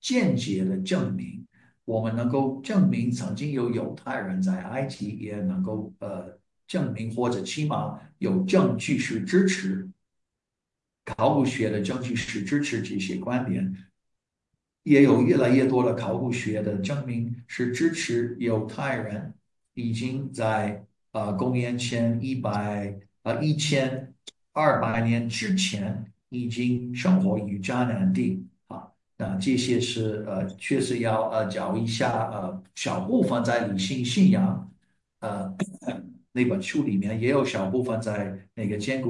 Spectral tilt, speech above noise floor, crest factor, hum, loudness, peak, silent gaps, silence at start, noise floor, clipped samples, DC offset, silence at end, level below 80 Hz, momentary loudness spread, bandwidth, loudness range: -6 dB/octave; 61 dB; 20 dB; none; -26 LUFS; -6 dBFS; none; 0.05 s; -86 dBFS; under 0.1%; under 0.1%; 0 s; -64 dBFS; 12 LU; 11.5 kHz; 6 LU